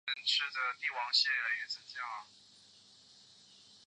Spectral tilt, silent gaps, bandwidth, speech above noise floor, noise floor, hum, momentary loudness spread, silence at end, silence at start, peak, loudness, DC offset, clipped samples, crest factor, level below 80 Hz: 2.5 dB/octave; none; 10 kHz; 26 dB; -61 dBFS; none; 13 LU; 0.1 s; 0.05 s; -16 dBFS; -33 LUFS; under 0.1%; under 0.1%; 22 dB; under -90 dBFS